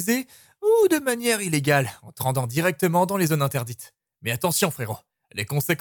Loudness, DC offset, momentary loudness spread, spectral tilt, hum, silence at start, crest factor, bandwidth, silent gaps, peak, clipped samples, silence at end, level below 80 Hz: -23 LUFS; under 0.1%; 13 LU; -4.5 dB/octave; none; 0 s; 16 dB; 19 kHz; none; -6 dBFS; under 0.1%; 0.05 s; -64 dBFS